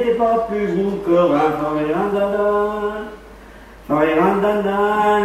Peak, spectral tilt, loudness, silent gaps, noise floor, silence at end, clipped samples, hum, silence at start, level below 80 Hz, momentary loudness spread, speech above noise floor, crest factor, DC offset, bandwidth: -4 dBFS; -7 dB/octave; -18 LUFS; none; -40 dBFS; 0 s; under 0.1%; none; 0 s; -46 dBFS; 7 LU; 23 dB; 14 dB; under 0.1%; 15 kHz